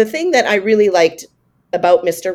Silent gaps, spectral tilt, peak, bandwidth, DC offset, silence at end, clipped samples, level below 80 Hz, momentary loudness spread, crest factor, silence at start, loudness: none; -4 dB/octave; 0 dBFS; 16.5 kHz; under 0.1%; 0 s; under 0.1%; -62 dBFS; 5 LU; 14 dB; 0 s; -14 LUFS